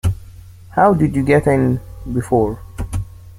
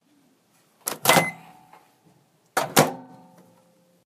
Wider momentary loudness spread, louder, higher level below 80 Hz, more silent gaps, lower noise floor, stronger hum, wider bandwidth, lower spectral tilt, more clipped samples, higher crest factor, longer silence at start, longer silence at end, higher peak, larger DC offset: second, 13 LU vs 18 LU; first, -17 LUFS vs -22 LUFS; first, -34 dBFS vs -66 dBFS; neither; second, -38 dBFS vs -63 dBFS; neither; about the same, 16 kHz vs 15.5 kHz; first, -8 dB/octave vs -3 dB/octave; neither; second, 16 dB vs 28 dB; second, 0.05 s vs 0.85 s; second, 0.05 s vs 1 s; about the same, -2 dBFS vs 0 dBFS; neither